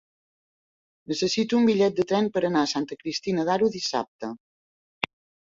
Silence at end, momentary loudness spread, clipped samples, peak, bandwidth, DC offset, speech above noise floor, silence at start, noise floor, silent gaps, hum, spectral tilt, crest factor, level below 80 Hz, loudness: 1.15 s; 12 LU; under 0.1%; -2 dBFS; 7.8 kHz; under 0.1%; over 66 dB; 1.1 s; under -90 dBFS; 4.08-4.19 s; none; -4.5 dB/octave; 24 dB; -66 dBFS; -25 LUFS